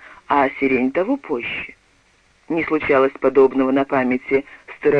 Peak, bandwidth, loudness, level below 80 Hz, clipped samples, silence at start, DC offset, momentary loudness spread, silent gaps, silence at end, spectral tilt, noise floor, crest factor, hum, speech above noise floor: -4 dBFS; 6.2 kHz; -19 LUFS; -52 dBFS; under 0.1%; 0.3 s; under 0.1%; 10 LU; none; 0 s; -7.5 dB/octave; -57 dBFS; 16 dB; none; 39 dB